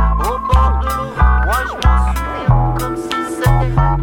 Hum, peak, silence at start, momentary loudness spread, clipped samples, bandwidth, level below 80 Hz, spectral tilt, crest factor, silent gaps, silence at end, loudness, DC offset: none; 0 dBFS; 0 s; 6 LU; under 0.1%; 17 kHz; -16 dBFS; -6.5 dB/octave; 14 dB; none; 0 s; -16 LUFS; under 0.1%